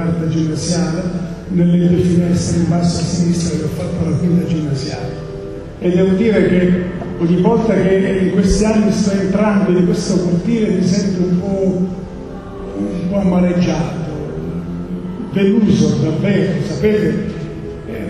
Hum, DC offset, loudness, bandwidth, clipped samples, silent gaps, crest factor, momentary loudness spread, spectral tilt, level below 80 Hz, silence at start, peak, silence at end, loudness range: none; under 0.1%; -16 LUFS; 11 kHz; under 0.1%; none; 14 dB; 12 LU; -7 dB/octave; -34 dBFS; 0 s; -2 dBFS; 0 s; 4 LU